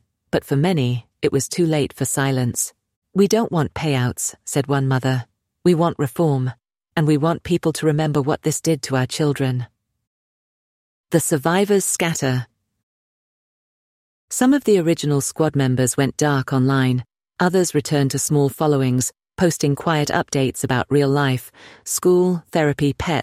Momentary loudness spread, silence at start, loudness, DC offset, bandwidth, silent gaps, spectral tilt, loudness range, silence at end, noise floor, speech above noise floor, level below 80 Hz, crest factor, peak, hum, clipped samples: 7 LU; 0.35 s; -20 LUFS; under 0.1%; 16 kHz; 2.96-3.02 s, 10.07-11.04 s, 12.83-14.28 s; -5.5 dB/octave; 3 LU; 0 s; under -90 dBFS; over 71 dB; -52 dBFS; 16 dB; -4 dBFS; none; under 0.1%